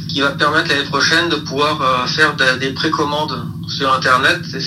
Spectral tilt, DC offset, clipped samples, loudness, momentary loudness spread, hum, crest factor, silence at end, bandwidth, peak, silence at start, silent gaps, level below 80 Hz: -3.5 dB/octave; under 0.1%; under 0.1%; -15 LUFS; 7 LU; none; 16 dB; 0 s; 15.5 kHz; 0 dBFS; 0 s; none; -48 dBFS